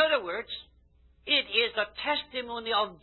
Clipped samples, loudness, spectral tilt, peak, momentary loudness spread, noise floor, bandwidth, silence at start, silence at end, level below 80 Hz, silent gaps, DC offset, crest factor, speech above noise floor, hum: under 0.1%; -28 LUFS; -6 dB/octave; -10 dBFS; 14 LU; -61 dBFS; 4.3 kHz; 0 s; 0.05 s; -62 dBFS; none; under 0.1%; 20 dB; 31 dB; none